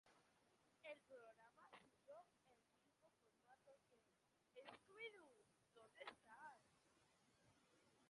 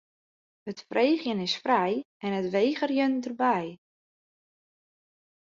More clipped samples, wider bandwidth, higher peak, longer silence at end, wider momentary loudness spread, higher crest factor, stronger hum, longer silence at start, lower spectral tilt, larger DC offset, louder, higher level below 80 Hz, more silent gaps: neither; first, 11 kHz vs 7.6 kHz; second, -44 dBFS vs -10 dBFS; second, 0 s vs 1.75 s; second, 10 LU vs 13 LU; first, 24 dB vs 18 dB; neither; second, 0.05 s vs 0.65 s; second, -3 dB/octave vs -5.5 dB/octave; neither; second, -63 LUFS vs -27 LUFS; second, under -90 dBFS vs -74 dBFS; second, none vs 2.05-2.20 s